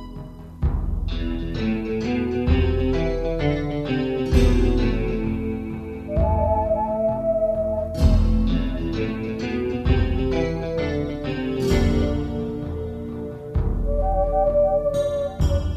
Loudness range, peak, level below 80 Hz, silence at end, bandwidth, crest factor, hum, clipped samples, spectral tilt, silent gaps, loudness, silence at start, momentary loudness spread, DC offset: 2 LU; -4 dBFS; -26 dBFS; 0 s; 9.4 kHz; 16 dB; none; under 0.1%; -8 dB/octave; none; -23 LUFS; 0 s; 8 LU; under 0.1%